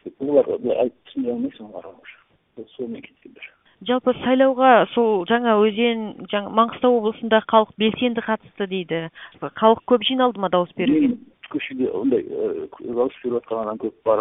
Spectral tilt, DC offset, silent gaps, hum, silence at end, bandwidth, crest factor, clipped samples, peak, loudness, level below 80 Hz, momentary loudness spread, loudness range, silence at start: -10 dB/octave; under 0.1%; none; none; 0 s; 3.9 kHz; 20 dB; under 0.1%; 0 dBFS; -20 LUFS; -62 dBFS; 16 LU; 7 LU; 0.05 s